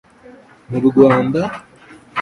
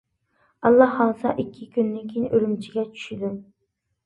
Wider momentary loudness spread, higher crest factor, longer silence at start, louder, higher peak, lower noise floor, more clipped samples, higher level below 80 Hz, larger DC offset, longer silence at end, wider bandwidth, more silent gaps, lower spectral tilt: about the same, 15 LU vs 14 LU; second, 16 dB vs 22 dB; about the same, 0.7 s vs 0.6 s; first, -15 LUFS vs -23 LUFS; about the same, 0 dBFS vs -2 dBFS; second, -43 dBFS vs -76 dBFS; neither; first, -52 dBFS vs -62 dBFS; neither; second, 0 s vs 0.65 s; about the same, 10.5 kHz vs 9.6 kHz; neither; about the same, -8 dB/octave vs -7.5 dB/octave